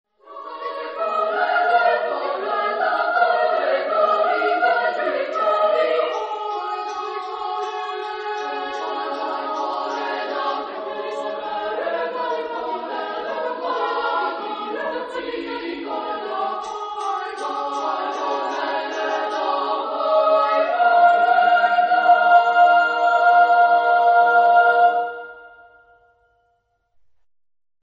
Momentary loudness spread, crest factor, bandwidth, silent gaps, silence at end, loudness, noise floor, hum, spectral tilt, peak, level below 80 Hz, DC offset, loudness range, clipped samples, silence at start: 13 LU; 18 dB; 7.4 kHz; none; 2.45 s; -20 LUFS; -67 dBFS; none; -2.5 dB/octave; -2 dBFS; -70 dBFS; under 0.1%; 11 LU; under 0.1%; 0.25 s